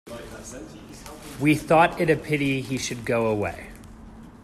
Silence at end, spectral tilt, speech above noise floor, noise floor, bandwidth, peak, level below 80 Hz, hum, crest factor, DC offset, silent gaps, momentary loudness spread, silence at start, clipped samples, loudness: 0 s; -5.5 dB/octave; 20 dB; -44 dBFS; 14.5 kHz; -6 dBFS; -50 dBFS; none; 20 dB; under 0.1%; none; 23 LU; 0.05 s; under 0.1%; -23 LUFS